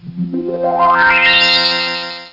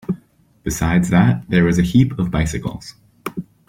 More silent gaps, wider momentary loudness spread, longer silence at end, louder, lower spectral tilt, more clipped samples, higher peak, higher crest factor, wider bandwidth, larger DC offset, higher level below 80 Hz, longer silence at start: neither; about the same, 13 LU vs 15 LU; second, 0.05 s vs 0.25 s; first, -11 LUFS vs -17 LUFS; second, -4 dB/octave vs -6.5 dB/octave; neither; about the same, -2 dBFS vs -2 dBFS; about the same, 12 dB vs 16 dB; second, 5.8 kHz vs 16 kHz; neither; second, -46 dBFS vs -36 dBFS; about the same, 0.05 s vs 0.1 s